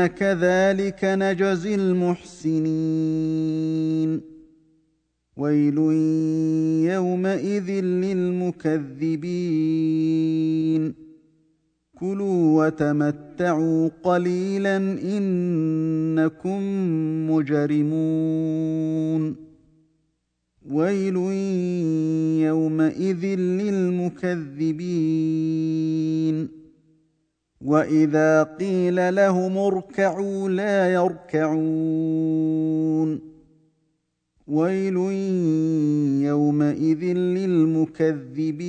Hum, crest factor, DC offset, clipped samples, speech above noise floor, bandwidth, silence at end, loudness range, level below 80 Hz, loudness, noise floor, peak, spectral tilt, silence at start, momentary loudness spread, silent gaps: 60 Hz at -50 dBFS; 18 dB; under 0.1%; under 0.1%; 52 dB; 9 kHz; 0 s; 4 LU; -64 dBFS; -22 LUFS; -74 dBFS; -4 dBFS; -8 dB/octave; 0 s; 6 LU; none